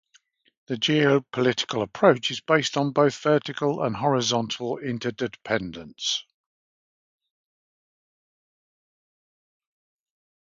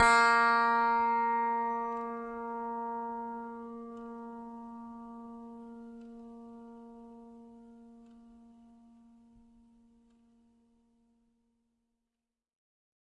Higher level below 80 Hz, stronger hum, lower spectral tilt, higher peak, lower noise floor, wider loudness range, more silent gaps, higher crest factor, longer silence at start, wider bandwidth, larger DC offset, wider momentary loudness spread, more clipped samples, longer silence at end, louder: about the same, -64 dBFS vs -66 dBFS; neither; first, -4.5 dB/octave vs -2.5 dB/octave; first, -2 dBFS vs -12 dBFS; second, -63 dBFS vs under -90 dBFS; second, 11 LU vs 25 LU; neither; about the same, 24 dB vs 22 dB; first, 0.7 s vs 0 s; second, 7.6 kHz vs 11 kHz; neither; second, 9 LU vs 26 LU; neither; second, 4.35 s vs 4.9 s; first, -24 LUFS vs -30 LUFS